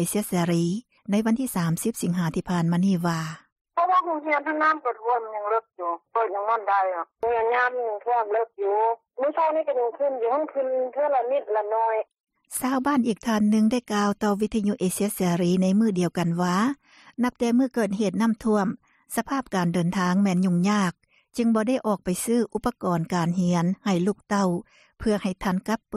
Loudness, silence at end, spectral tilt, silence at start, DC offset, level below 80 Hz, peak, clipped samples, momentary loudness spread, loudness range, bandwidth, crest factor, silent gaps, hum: -25 LUFS; 0 s; -6 dB/octave; 0 s; under 0.1%; -56 dBFS; -10 dBFS; under 0.1%; 6 LU; 2 LU; 15 kHz; 14 dB; 3.52-3.65 s, 12.20-12.24 s; none